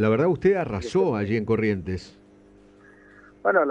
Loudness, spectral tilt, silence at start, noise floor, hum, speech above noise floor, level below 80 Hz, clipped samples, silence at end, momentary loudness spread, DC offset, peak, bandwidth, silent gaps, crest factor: -24 LUFS; -7.5 dB/octave; 0 s; -52 dBFS; 50 Hz at -50 dBFS; 29 dB; -52 dBFS; under 0.1%; 0 s; 8 LU; under 0.1%; -8 dBFS; 9.2 kHz; none; 18 dB